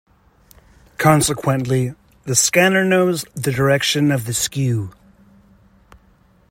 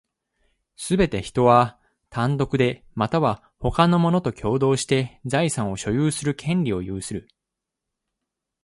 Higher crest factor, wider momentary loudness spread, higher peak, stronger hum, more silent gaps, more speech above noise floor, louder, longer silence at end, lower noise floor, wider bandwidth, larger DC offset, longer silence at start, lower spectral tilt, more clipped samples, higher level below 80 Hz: about the same, 18 dB vs 20 dB; about the same, 10 LU vs 10 LU; about the same, 0 dBFS vs -2 dBFS; neither; neither; second, 37 dB vs 63 dB; first, -17 LUFS vs -22 LUFS; first, 1.6 s vs 1.45 s; second, -54 dBFS vs -84 dBFS; first, 16.5 kHz vs 11.5 kHz; neither; first, 1 s vs 0.8 s; second, -4 dB/octave vs -6 dB/octave; neither; about the same, -50 dBFS vs -46 dBFS